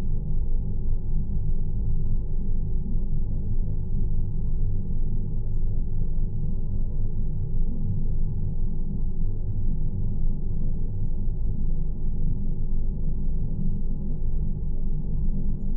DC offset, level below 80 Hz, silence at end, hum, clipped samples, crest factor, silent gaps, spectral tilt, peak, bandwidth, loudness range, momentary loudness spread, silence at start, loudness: under 0.1%; -24 dBFS; 0 s; none; under 0.1%; 8 dB; none; -15 dB/octave; -12 dBFS; 1 kHz; 1 LU; 2 LU; 0 s; -31 LUFS